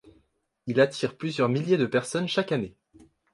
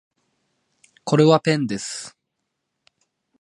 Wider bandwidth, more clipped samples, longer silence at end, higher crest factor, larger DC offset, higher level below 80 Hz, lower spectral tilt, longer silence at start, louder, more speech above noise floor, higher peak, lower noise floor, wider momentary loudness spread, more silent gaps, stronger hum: about the same, 11.5 kHz vs 11.5 kHz; neither; second, 0.65 s vs 1.3 s; about the same, 18 dB vs 22 dB; neither; about the same, -66 dBFS vs -66 dBFS; about the same, -5.5 dB/octave vs -5.5 dB/octave; second, 0.05 s vs 1.05 s; second, -26 LUFS vs -19 LUFS; second, 44 dB vs 60 dB; second, -8 dBFS vs -2 dBFS; second, -69 dBFS vs -78 dBFS; second, 7 LU vs 19 LU; neither; neither